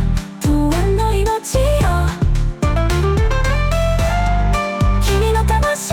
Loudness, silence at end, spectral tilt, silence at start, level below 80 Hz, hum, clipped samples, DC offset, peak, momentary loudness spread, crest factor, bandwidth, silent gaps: -17 LUFS; 0 s; -5.5 dB/octave; 0 s; -18 dBFS; none; under 0.1%; under 0.1%; -6 dBFS; 3 LU; 10 dB; 17.5 kHz; none